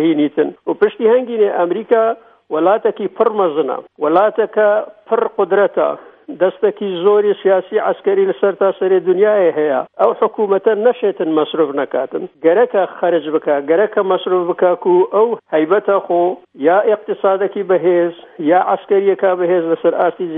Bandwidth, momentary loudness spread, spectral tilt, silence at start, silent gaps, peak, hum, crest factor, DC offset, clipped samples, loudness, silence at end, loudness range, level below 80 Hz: 3.9 kHz; 6 LU; -9.5 dB/octave; 0 s; none; 0 dBFS; none; 14 dB; under 0.1%; under 0.1%; -15 LUFS; 0 s; 1 LU; -68 dBFS